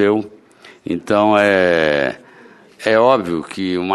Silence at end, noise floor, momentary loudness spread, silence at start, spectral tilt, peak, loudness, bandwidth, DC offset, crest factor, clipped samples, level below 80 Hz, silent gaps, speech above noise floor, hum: 0 s; -45 dBFS; 13 LU; 0 s; -5.5 dB/octave; 0 dBFS; -16 LUFS; 12 kHz; under 0.1%; 16 dB; under 0.1%; -54 dBFS; none; 30 dB; none